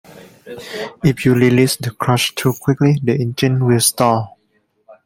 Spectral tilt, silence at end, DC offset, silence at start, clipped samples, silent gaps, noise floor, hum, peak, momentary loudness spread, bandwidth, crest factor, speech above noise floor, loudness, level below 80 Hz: -5 dB/octave; 0.1 s; under 0.1%; 0.15 s; under 0.1%; none; -63 dBFS; none; 0 dBFS; 15 LU; 16.5 kHz; 16 dB; 47 dB; -15 LUFS; -50 dBFS